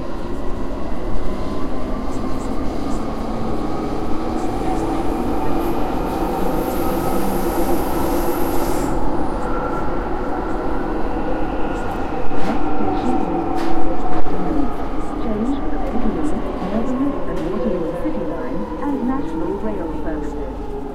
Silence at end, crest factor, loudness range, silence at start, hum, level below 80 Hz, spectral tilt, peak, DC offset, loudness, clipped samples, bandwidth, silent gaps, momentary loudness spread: 0 s; 14 dB; 3 LU; 0 s; none; -28 dBFS; -6.5 dB/octave; -2 dBFS; under 0.1%; -23 LUFS; under 0.1%; 15 kHz; none; 5 LU